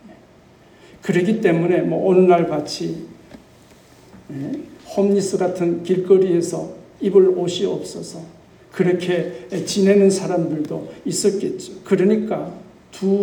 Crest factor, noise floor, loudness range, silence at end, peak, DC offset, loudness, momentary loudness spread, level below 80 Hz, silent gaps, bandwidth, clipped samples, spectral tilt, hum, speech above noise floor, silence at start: 18 dB; -49 dBFS; 3 LU; 0 s; -2 dBFS; under 0.1%; -19 LUFS; 16 LU; -60 dBFS; none; 13 kHz; under 0.1%; -6 dB/octave; none; 30 dB; 0.05 s